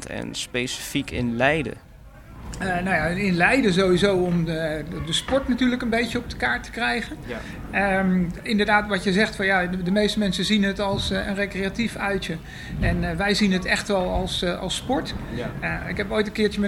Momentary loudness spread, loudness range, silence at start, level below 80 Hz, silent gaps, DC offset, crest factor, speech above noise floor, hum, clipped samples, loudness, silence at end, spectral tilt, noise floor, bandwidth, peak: 10 LU; 3 LU; 0 s; -38 dBFS; none; under 0.1%; 20 dB; 20 dB; none; under 0.1%; -23 LUFS; 0 s; -5 dB/octave; -43 dBFS; 16 kHz; -4 dBFS